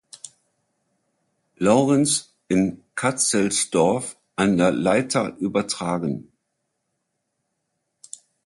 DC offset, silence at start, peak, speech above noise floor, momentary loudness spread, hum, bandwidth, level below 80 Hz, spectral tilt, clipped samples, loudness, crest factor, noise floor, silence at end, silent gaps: under 0.1%; 0.25 s; -4 dBFS; 56 dB; 19 LU; none; 11.5 kHz; -58 dBFS; -4.5 dB/octave; under 0.1%; -21 LUFS; 18 dB; -76 dBFS; 2.25 s; none